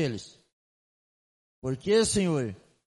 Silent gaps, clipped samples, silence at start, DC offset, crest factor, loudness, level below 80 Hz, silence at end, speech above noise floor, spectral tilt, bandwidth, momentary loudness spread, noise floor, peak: 0.53-1.62 s; under 0.1%; 0 s; under 0.1%; 18 dB; -27 LUFS; -56 dBFS; 0.3 s; over 63 dB; -4.5 dB/octave; 11.5 kHz; 15 LU; under -90 dBFS; -12 dBFS